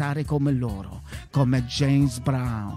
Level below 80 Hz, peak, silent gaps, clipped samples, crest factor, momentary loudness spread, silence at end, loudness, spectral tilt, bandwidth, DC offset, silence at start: -42 dBFS; -10 dBFS; none; under 0.1%; 14 dB; 13 LU; 0 s; -24 LUFS; -6.5 dB/octave; 13 kHz; under 0.1%; 0 s